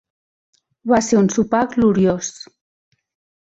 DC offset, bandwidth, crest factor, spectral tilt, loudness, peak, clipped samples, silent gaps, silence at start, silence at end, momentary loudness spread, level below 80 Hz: under 0.1%; 8.2 kHz; 16 dB; -5.5 dB/octave; -17 LUFS; -4 dBFS; under 0.1%; none; 0.85 s; 1.1 s; 14 LU; -50 dBFS